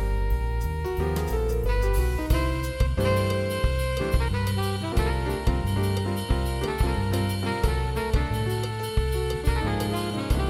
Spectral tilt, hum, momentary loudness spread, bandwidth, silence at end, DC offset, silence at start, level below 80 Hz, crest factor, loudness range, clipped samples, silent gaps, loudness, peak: -6 dB/octave; none; 3 LU; 16.5 kHz; 0 s; under 0.1%; 0 s; -28 dBFS; 16 dB; 1 LU; under 0.1%; none; -26 LUFS; -8 dBFS